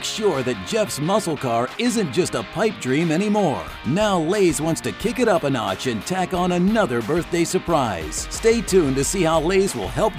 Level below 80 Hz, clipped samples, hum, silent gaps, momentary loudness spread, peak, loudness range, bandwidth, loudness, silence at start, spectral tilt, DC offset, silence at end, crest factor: -40 dBFS; under 0.1%; none; none; 6 LU; -4 dBFS; 1 LU; 16 kHz; -21 LUFS; 0 s; -5 dB/octave; under 0.1%; 0 s; 16 dB